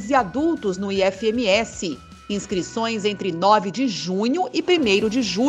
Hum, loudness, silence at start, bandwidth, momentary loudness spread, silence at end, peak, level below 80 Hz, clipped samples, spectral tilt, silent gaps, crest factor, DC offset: none; -21 LUFS; 0 s; 10.5 kHz; 9 LU; 0 s; -2 dBFS; -52 dBFS; under 0.1%; -4.5 dB/octave; none; 18 dB; under 0.1%